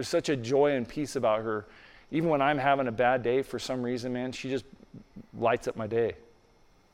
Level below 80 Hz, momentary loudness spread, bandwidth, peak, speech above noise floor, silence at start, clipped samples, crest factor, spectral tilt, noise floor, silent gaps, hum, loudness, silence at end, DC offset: -60 dBFS; 9 LU; 15.5 kHz; -12 dBFS; 32 dB; 0 s; under 0.1%; 18 dB; -5.5 dB/octave; -61 dBFS; none; none; -29 LUFS; 0.75 s; under 0.1%